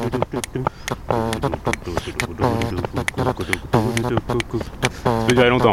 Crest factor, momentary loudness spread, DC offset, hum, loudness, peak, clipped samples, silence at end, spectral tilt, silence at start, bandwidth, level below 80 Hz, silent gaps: 20 dB; 8 LU; under 0.1%; none; -21 LUFS; -2 dBFS; under 0.1%; 0 s; -5.5 dB/octave; 0 s; 15.5 kHz; -38 dBFS; none